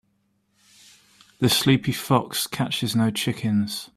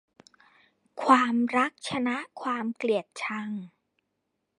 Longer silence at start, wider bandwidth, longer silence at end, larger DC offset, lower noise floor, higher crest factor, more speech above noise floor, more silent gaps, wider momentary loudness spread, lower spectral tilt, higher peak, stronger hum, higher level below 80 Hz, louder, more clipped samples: first, 1.4 s vs 0.95 s; first, 16 kHz vs 11 kHz; second, 0.1 s vs 0.9 s; neither; second, -69 dBFS vs -80 dBFS; about the same, 20 dB vs 24 dB; second, 46 dB vs 53 dB; neither; second, 6 LU vs 13 LU; about the same, -4.5 dB/octave vs -4.5 dB/octave; about the same, -4 dBFS vs -4 dBFS; neither; first, -58 dBFS vs -76 dBFS; first, -22 LUFS vs -27 LUFS; neither